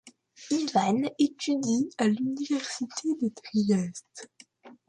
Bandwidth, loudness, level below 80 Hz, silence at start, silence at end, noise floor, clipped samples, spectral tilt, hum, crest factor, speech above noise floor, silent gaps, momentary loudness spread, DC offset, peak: 10.5 kHz; -28 LUFS; -74 dBFS; 0.05 s; 0.15 s; -53 dBFS; under 0.1%; -5 dB/octave; none; 18 dB; 26 dB; none; 8 LU; under 0.1%; -12 dBFS